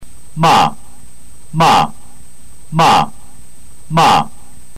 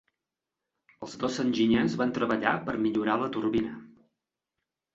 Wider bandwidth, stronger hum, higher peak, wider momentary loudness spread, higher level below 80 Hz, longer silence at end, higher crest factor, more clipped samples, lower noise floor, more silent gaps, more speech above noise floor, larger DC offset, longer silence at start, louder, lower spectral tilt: first, 16 kHz vs 7.8 kHz; neither; first, -4 dBFS vs -8 dBFS; about the same, 13 LU vs 13 LU; first, -44 dBFS vs -62 dBFS; second, 0.5 s vs 1.1 s; second, 10 dB vs 22 dB; neither; second, -42 dBFS vs -88 dBFS; neither; second, 31 dB vs 61 dB; first, 6% vs under 0.1%; second, 0 s vs 1 s; first, -13 LUFS vs -28 LUFS; second, -4.5 dB/octave vs -6 dB/octave